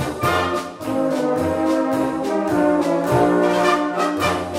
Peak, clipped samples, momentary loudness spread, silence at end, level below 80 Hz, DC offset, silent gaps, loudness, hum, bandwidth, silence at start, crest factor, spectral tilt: -2 dBFS; under 0.1%; 5 LU; 0 s; -48 dBFS; under 0.1%; none; -19 LUFS; none; 16 kHz; 0 s; 16 dB; -5.5 dB/octave